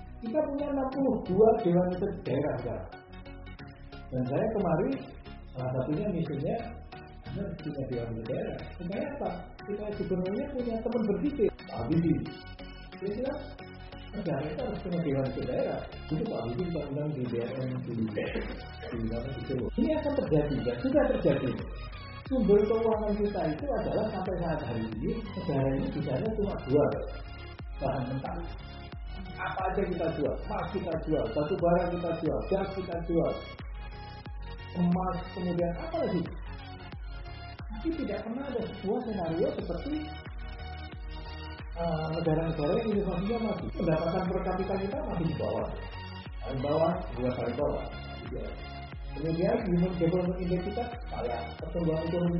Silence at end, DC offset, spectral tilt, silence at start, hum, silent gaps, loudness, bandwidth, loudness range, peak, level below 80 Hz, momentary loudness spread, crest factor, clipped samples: 0 s; under 0.1%; -7 dB/octave; 0 s; none; none; -32 LUFS; 5.8 kHz; 6 LU; -10 dBFS; -44 dBFS; 15 LU; 22 dB; under 0.1%